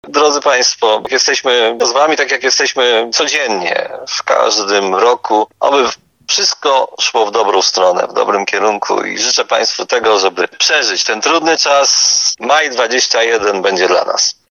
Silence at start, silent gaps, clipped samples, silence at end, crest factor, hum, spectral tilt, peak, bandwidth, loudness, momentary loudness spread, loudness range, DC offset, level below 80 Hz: 0.05 s; none; under 0.1%; 0.2 s; 12 dB; none; 0 dB/octave; 0 dBFS; 12 kHz; -12 LUFS; 4 LU; 2 LU; under 0.1%; -62 dBFS